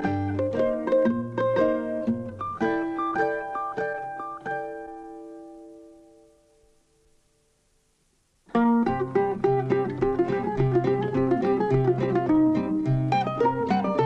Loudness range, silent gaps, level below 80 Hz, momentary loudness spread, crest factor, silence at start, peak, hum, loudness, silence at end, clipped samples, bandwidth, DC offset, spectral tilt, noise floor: 13 LU; none; -50 dBFS; 12 LU; 14 dB; 0 s; -12 dBFS; none; -25 LUFS; 0 s; under 0.1%; 8.2 kHz; under 0.1%; -9 dB/octave; -67 dBFS